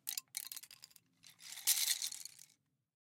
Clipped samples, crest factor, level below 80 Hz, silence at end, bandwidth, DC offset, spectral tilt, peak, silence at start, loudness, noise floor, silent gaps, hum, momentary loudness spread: under 0.1%; 28 dB; under -90 dBFS; 0.65 s; 17 kHz; under 0.1%; 4 dB/octave; -16 dBFS; 0.05 s; -37 LUFS; -74 dBFS; none; none; 23 LU